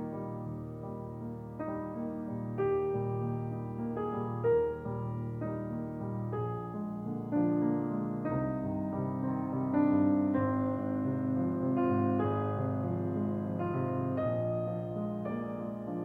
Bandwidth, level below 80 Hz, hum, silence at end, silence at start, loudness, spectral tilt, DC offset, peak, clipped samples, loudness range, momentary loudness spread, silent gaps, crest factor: 4 kHz; -60 dBFS; none; 0 s; 0 s; -33 LUFS; -11 dB/octave; under 0.1%; -16 dBFS; under 0.1%; 5 LU; 9 LU; none; 16 dB